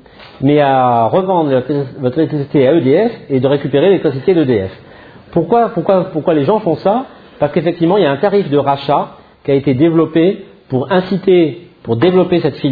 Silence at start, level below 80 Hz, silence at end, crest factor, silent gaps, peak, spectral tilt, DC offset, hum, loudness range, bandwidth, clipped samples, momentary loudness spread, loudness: 0.2 s; -50 dBFS; 0 s; 12 dB; none; 0 dBFS; -10.5 dB/octave; under 0.1%; none; 2 LU; 5 kHz; under 0.1%; 8 LU; -13 LUFS